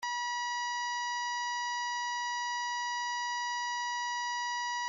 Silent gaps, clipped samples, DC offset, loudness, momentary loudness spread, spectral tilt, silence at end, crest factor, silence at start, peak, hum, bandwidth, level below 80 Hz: none; under 0.1%; under 0.1%; -33 LUFS; 0 LU; 5 dB/octave; 0 s; 8 dB; 0 s; -28 dBFS; none; 7.4 kHz; -88 dBFS